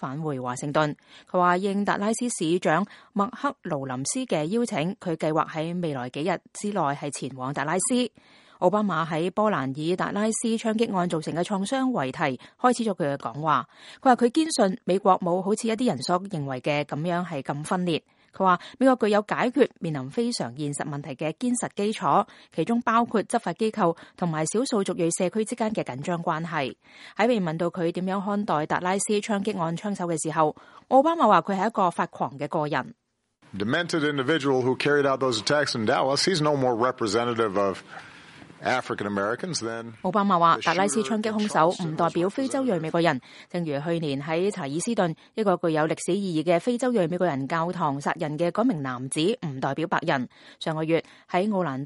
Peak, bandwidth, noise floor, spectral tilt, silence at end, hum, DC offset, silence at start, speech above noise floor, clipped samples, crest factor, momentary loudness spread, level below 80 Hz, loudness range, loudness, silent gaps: -4 dBFS; 11.5 kHz; -62 dBFS; -5 dB/octave; 0 s; none; under 0.1%; 0 s; 36 dB; under 0.1%; 20 dB; 8 LU; -70 dBFS; 3 LU; -25 LUFS; none